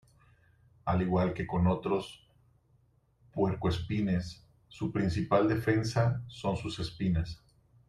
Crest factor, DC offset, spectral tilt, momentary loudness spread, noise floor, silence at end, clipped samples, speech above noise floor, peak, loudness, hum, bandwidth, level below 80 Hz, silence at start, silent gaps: 18 dB; under 0.1%; -7.5 dB/octave; 11 LU; -68 dBFS; 0.55 s; under 0.1%; 38 dB; -14 dBFS; -31 LUFS; none; 12 kHz; -52 dBFS; 0.85 s; none